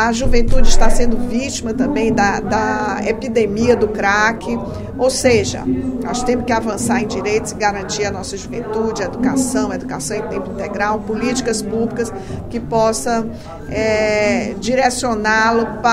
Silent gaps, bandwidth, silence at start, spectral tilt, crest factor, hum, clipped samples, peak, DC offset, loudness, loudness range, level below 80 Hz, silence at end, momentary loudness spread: none; 12.5 kHz; 0 s; -4.5 dB/octave; 16 dB; none; under 0.1%; 0 dBFS; under 0.1%; -18 LUFS; 4 LU; -22 dBFS; 0 s; 9 LU